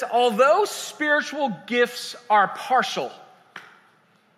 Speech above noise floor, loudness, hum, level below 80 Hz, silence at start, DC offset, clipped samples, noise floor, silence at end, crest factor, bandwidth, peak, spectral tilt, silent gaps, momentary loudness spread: 38 dB; -22 LUFS; none; -86 dBFS; 0 s; under 0.1%; under 0.1%; -60 dBFS; 0.75 s; 18 dB; 15.5 kHz; -6 dBFS; -3 dB/octave; none; 9 LU